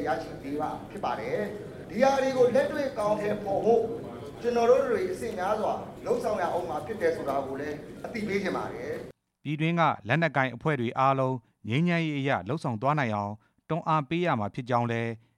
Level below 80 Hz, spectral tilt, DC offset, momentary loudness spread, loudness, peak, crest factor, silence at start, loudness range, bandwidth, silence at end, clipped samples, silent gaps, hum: -60 dBFS; -6.5 dB/octave; under 0.1%; 12 LU; -28 LUFS; -8 dBFS; 20 dB; 0 s; 4 LU; 15 kHz; 0.2 s; under 0.1%; none; none